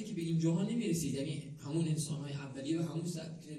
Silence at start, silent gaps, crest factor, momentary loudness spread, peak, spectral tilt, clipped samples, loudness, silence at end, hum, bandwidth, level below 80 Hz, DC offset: 0 s; none; 14 dB; 9 LU; -22 dBFS; -6 dB/octave; under 0.1%; -37 LUFS; 0 s; none; 13.5 kHz; -68 dBFS; under 0.1%